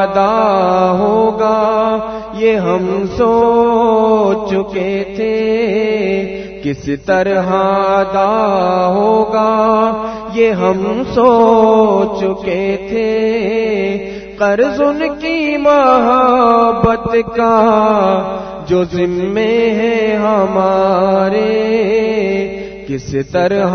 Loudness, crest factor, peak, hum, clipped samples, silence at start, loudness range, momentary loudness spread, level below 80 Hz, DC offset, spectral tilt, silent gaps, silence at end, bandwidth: -13 LUFS; 12 dB; 0 dBFS; none; under 0.1%; 0 s; 3 LU; 8 LU; -40 dBFS; under 0.1%; -7 dB/octave; none; 0 s; 6.6 kHz